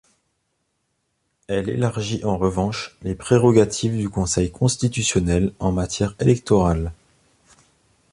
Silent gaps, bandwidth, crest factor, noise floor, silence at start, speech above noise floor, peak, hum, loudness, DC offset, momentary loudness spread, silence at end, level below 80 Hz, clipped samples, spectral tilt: none; 11.5 kHz; 18 dB; -72 dBFS; 1.5 s; 52 dB; -2 dBFS; none; -21 LUFS; under 0.1%; 9 LU; 1.2 s; -38 dBFS; under 0.1%; -5.5 dB/octave